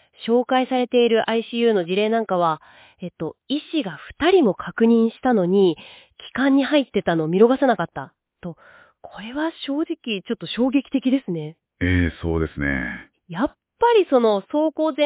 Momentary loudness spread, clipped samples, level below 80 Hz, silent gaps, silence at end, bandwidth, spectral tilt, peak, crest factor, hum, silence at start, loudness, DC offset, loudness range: 15 LU; under 0.1%; -42 dBFS; none; 0 s; 4 kHz; -10.5 dB/octave; -4 dBFS; 16 dB; none; 0.2 s; -21 LUFS; under 0.1%; 6 LU